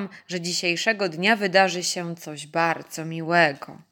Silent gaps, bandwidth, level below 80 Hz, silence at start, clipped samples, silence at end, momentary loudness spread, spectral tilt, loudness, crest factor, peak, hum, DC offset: none; 17 kHz; -78 dBFS; 0 s; under 0.1%; 0.15 s; 13 LU; -3.5 dB/octave; -23 LUFS; 20 dB; -4 dBFS; none; under 0.1%